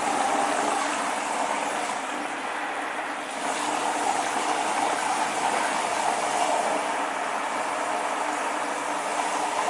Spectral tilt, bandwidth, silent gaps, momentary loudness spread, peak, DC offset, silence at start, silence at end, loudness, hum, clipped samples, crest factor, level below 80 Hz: -1.5 dB/octave; 11.5 kHz; none; 5 LU; -10 dBFS; under 0.1%; 0 s; 0 s; -26 LUFS; none; under 0.1%; 16 dB; -72 dBFS